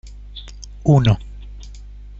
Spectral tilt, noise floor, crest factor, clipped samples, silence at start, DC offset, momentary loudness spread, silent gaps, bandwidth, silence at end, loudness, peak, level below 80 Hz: -7.5 dB/octave; -36 dBFS; 18 dB; under 0.1%; 0.05 s; under 0.1%; 24 LU; none; 7.6 kHz; 0 s; -17 LUFS; -2 dBFS; -34 dBFS